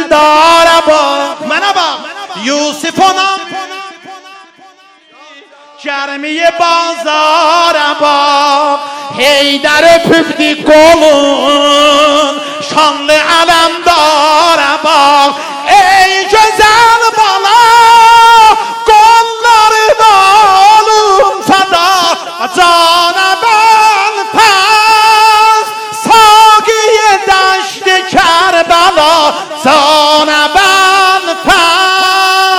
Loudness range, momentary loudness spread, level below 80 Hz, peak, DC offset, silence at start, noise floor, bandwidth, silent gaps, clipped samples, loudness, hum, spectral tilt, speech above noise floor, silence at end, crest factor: 8 LU; 9 LU; -42 dBFS; 0 dBFS; 0.3%; 0 s; -40 dBFS; 19.5 kHz; none; 4%; -6 LUFS; none; -1.5 dB/octave; 33 dB; 0 s; 6 dB